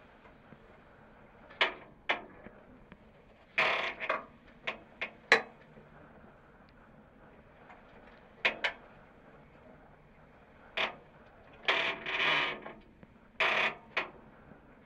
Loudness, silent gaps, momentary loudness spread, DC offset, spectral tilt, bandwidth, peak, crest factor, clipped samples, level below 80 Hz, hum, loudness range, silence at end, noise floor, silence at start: -32 LUFS; none; 26 LU; under 0.1%; -2.5 dB/octave; 13.5 kHz; -6 dBFS; 32 dB; under 0.1%; -66 dBFS; none; 8 LU; 0.55 s; -59 dBFS; 0.25 s